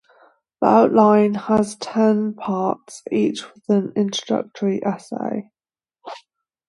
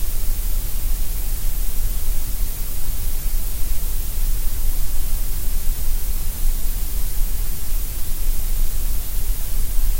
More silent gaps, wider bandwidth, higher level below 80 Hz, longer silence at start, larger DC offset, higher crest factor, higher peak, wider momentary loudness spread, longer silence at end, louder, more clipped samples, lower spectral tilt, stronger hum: neither; second, 11.5 kHz vs 16.5 kHz; second, -62 dBFS vs -20 dBFS; first, 0.6 s vs 0 s; neither; first, 20 dB vs 12 dB; about the same, -2 dBFS vs -4 dBFS; first, 16 LU vs 1 LU; first, 0.5 s vs 0 s; first, -20 LUFS vs -27 LUFS; neither; first, -6 dB/octave vs -3.5 dB/octave; neither